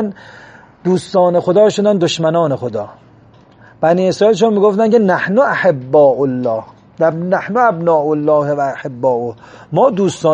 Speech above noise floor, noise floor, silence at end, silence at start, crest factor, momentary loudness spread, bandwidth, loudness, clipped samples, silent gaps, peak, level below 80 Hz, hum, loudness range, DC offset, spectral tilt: 31 dB; -44 dBFS; 0 s; 0 s; 12 dB; 9 LU; 10 kHz; -14 LUFS; under 0.1%; none; 0 dBFS; -58 dBFS; none; 3 LU; under 0.1%; -6 dB/octave